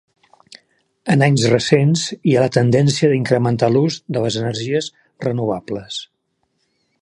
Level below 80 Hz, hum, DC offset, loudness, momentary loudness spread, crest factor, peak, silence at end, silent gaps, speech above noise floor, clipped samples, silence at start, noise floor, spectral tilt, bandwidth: -56 dBFS; none; under 0.1%; -17 LUFS; 12 LU; 18 dB; 0 dBFS; 0.95 s; none; 53 dB; under 0.1%; 1.05 s; -69 dBFS; -6 dB/octave; 11 kHz